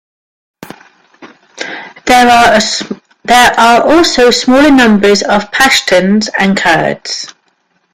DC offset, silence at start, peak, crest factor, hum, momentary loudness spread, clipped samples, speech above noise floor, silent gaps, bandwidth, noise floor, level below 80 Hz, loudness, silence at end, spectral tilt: under 0.1%; 0.6 s; 0 dBFS; 10 dB; none; 17 LU; 0.2%; 50 dB; none; 16.5 kHz; -57 dBFS; -38 dBFS; -7 LUFS; 0.65 s; -3.5 dB/octave